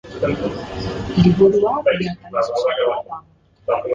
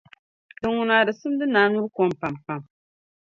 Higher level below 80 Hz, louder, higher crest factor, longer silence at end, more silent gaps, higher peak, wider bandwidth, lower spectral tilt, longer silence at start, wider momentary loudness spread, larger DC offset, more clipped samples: first, -42 dBFS vs -62 dBFS; first, -19 LUFS vs -22 LUFS; about the same, 16 dB vs 20 dB; second, 0 s vs 0.7 s; neither; about the same, -2 dBFS vs -4 dBFS; about the same, 7.6 kHz vs 7.4 kHz; about the same, -7.5 dB/octave vs -6.5 dB/octave; second, 0.05 s vs 0.65 s; about the same, 13 LU vs 13 LU; neither; neither